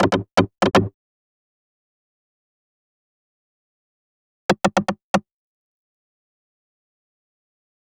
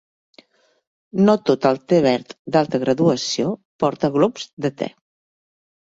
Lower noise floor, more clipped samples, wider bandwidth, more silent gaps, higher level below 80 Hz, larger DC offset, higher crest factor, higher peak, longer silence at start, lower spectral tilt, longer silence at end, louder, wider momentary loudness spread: first, under -90 dBFS vs -53 dBFS; neither; first, 15.5 kHz vs 8 kHz; first, 0.94-4.49 s, 5.04-5.14 s vs 2.39-2.45 s, 3.65-3.79 s, 4.53-4.57 s; first, -52 dBFS vs -62 dBFS; neither; first, 24 dB vs 18 dB; about the same, -2 dBFS vs -2 dBFS; second, 0 s vs 1.15 s; about the same, -5.5 dB/octave vs -6 dB/octave; first, 2.8 s vs 1.1 s; about the same, -21 LUFS vs -20 LUFS; about the same, 7 LU vs 9 LU